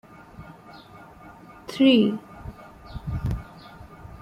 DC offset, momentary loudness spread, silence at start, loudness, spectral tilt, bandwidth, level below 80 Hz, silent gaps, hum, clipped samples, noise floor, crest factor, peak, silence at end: under 0.1%; 28 LU; 0.4 s; -23 LUFS; -7 dB/octave; 12.5 kHz; -44 dBFS; none; none; under 0.1%; -46 dBFS; 20 dB; -6 dBFS; 0.1 s